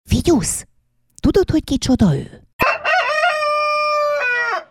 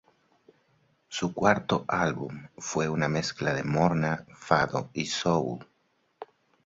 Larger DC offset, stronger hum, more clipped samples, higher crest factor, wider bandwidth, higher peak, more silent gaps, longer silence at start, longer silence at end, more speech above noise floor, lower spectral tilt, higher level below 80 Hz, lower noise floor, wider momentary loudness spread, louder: neither; neither; neither; second, 14 dB vs 24 dB; first, 17 kHz vs 7.8 kHz; first, -2 dBFS vs -6 dBFS; first, 2.53-2.59 s vs none; second, 0.05 s vs 1.1 s; second, 0.05 s vs 0.4 s; about the same, 44 dB vs 44 dB; about the same, -5 dB/octave vs -5 dB/octave; first, -34 dBFS vs -58 dBFS; second, -60 dBFS vs -71 dBFS; second, 6 LU vs 14 LU; first, -17 LUFS vs -28 LUFS